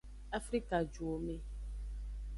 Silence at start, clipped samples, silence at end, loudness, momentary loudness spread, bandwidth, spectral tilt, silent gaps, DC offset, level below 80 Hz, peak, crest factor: 0.05 s; under 0.1%; 0 s; -41 LUFS; 10 LU; 11.5 kHz; -6 dB/octave; none; under 0.1%; -46 dBFS; -20 dBFS; 20 dB